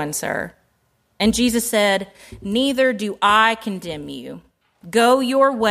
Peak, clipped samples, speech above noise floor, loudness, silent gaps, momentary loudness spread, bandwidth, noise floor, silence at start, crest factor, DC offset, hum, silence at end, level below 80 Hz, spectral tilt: -2 dBFS; under 0.1%; 46 dB; -18 LUFS; none; 17 LU; 15.5 kHz; -65 dBFS; 0 s; 18 dB; under 0.1%; none; 0 s; -48 dBFS; -3.5 dB/octave